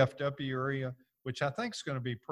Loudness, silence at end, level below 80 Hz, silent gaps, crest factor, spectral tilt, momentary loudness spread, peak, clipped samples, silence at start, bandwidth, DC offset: -36 LUFS; 0 s; -68 dBFS; none; 22 dB; -6 dB/octave; 8 LU; -12 dBFS; under 0.1%; 0 s; 11.5 kHz; under 0.1%